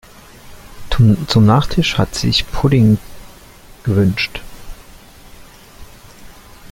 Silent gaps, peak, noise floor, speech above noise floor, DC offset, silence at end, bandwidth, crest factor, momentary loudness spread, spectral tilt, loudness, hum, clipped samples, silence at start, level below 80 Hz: none; 0 dBFS; -40 dBFS; 27 dB; under 0.1%; 0.05 s; 16.5 kHz; 16 dB; 10 LU; -6 dB/octave; -15 LUFS; none; under 0.1%; 0.45 s; -32 dBFS